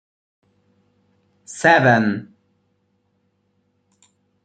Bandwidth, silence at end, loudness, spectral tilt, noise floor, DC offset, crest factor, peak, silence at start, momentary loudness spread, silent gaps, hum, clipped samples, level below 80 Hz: 9.4 kHz; 2.2 s; -16 LUFS; -5.5 dB/octave; -67 dBFS; under 0.1%; 22 dB; -2 dBFS; 1.5 s; 18 LU; none; none; under 0.1%; -66 dBFS